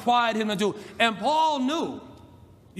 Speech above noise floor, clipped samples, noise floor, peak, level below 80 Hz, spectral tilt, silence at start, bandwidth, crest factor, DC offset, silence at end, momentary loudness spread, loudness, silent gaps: 27 dB; under 0.1%; -51 dBFS; -6 dBFS; -66 dBFS; -4 dB/octave; 0 s; 15 kHz; 18 dB; under 0.1%; 0 s; 8 LU; -25 LUFS; none